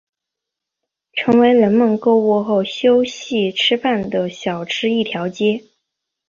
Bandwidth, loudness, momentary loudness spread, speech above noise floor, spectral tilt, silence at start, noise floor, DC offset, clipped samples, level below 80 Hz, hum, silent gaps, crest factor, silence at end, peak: 7.4 kHz; -17 LUFS; 9 LU; 67 dB; -5.5 dB/octave; 1.15 s; -83 dBFS; under 0.1%; under 0.1%; -58 dBFS; none; none; 16 dB; 0.7 s; -2 dBFS